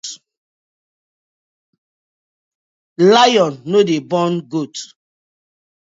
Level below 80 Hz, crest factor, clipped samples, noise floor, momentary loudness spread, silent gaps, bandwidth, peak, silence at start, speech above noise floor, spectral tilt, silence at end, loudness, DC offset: -70 dBFS; 20 dB; under 0.1%; under -90 dBFS; 17 LU; 0.37-2.96 s; 8 kHz; 0 dBFS; 0.05 s; over 76 dB; -4.5 dB/octave; 1.1 s; -14 LUFS; under 0.1%